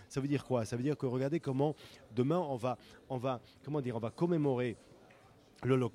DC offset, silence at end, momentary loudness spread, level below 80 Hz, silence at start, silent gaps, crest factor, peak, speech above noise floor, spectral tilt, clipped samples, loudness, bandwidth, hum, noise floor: under 0.1%; 0.05 s; 10 LU; -70 dBFS; 0 s; none; 18 dB; -16 dBFS; 27 dB; -7.5 dB/octave; under 0.1%; -36 LUFS; 13 kHz; none; -61 dBFS